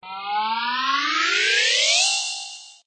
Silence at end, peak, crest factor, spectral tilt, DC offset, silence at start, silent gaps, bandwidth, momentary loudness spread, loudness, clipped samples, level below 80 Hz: 0.15 s; -6 dBFS; 16 dB; 2.5 dB/octave; under 0.1%; 0.05 s; none; 9.4 kHz; 11 LU; -19 LUFS; under 0.1%; -84 dBFS